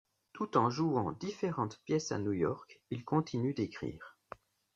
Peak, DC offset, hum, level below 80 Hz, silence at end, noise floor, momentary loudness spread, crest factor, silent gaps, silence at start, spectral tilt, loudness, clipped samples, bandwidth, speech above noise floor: -14 dBFS; under 0.1%; none; -70 dBFS; 0.7 s; -55 dBFS; 19 LU; 22 dB; none; 0.35 s; -6.5 dB/octave; -35 LUFS; under 0.1%; 7.6 kHz; 20 dB